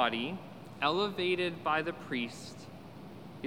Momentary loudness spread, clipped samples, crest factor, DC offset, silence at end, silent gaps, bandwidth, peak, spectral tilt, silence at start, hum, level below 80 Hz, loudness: 18 LU; under 0.1%; 22 dB; 0.1%; 0 s; none; 16 kHz; -14 dBFS; -5 dB/octave; 0 s; none; -80 dBFS; -33 LUFS